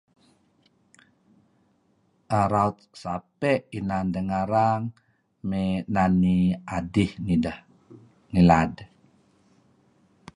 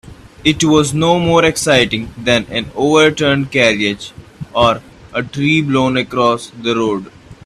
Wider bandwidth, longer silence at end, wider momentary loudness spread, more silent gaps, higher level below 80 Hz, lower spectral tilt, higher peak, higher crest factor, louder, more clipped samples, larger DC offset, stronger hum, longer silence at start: second, 10.5 kHz vs 13.5 kHz; first, 1.5 s vs 0.1 s; about the same, 13 LU vs 11 LU; neither; about the same, -46 dBFS vs -42 dBFS; first, -8 dB/octave vs -4.5 dB/octave; second, -4 dBFS vs 0 dBFS; first, 22 dB vs 14 dB; second, -25 LUFS vs -14 LUFS; neither; neither; neither; first, 2.3 s vs 0.05 s